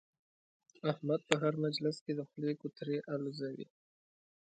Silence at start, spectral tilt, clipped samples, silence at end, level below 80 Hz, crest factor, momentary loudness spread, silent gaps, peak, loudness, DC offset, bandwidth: 0.85 s; -6 dB/octave; under 0.1%; 0.85 s; -84 dBFS; 32 dB; 10 LU; 2.01-2.06 s; -6 dBFS; -37 LUFS; under 0.1%; 9 kHz